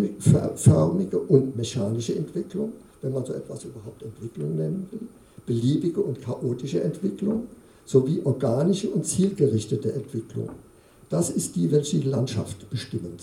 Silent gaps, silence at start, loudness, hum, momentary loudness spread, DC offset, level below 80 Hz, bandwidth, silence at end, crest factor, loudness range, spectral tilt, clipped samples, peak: none; 0 s; -25 LUFS; none; 15 LU; under 0.1%; -58 dBFS; 15.5 kHz; 0 s; 22 dB; 6 LU; -7 dB/octave; under 0.1%; -2 dBFS